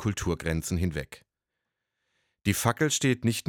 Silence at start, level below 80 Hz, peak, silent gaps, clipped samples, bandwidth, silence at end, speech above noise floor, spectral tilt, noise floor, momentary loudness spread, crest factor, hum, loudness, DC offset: 0 s; -46 dBFS; -8 dBFS; none; under 0.1%; 17.5 kHz; 0.05 s; 58 dB; -4.5 dB/octave; -85 dBFS; 8 LU; 22 dB; none; -28 LUFS; under 0.1%